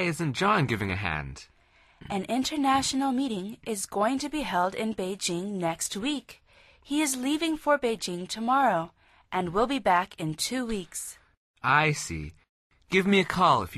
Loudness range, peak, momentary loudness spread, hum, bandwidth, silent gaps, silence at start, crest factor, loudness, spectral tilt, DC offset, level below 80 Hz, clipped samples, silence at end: 3 LU; -8 dBFS; 11 LU; none; 13.5 kHz; 11.37-11.54 s, 12.49-12.70 s; 0 s; 20 dB; -27 LUFS; -4 dB/octave; under 0.1%; -52 dBFS; under 0.1%; 0 s